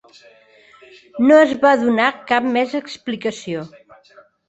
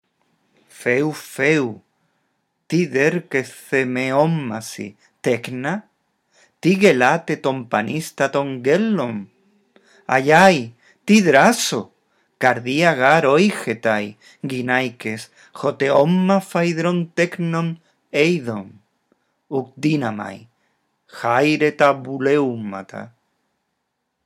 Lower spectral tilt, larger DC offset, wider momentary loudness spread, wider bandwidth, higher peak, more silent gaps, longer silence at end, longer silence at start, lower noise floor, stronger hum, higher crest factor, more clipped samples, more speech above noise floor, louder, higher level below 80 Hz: about the same, -5 dB/octave vs -5.5 dB/octave; neither; about the same, 16 LU vs 16 LU; second, 8.2 kHz vs 16 kHz; about the same, -2 dBFS vs 0 dBFS; neither; second, 0.8 s vs 1.15 s; first, 1.15 s vs 0.8 s; second, -50 dBFS vs -75 dBFS; neither; about the same, 18 dB vs 20 dB; neither; second, 33 dB vs 56 dB; about the same, -17 LUFS vs -19 LUFS; first, -62 dBFS vs -70 dBFS